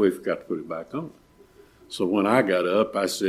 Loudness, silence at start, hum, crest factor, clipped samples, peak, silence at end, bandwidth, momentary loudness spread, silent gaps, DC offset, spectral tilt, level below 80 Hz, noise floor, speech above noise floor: -25 LUFS; 0 s; none; 20 dB; under 0.1%; -6 dBFS; 0 s; 16 kHz; 14 LU; none; under 0.1%; -5 dB/octave; -64 dBFS; -54 dBFS; 30 dB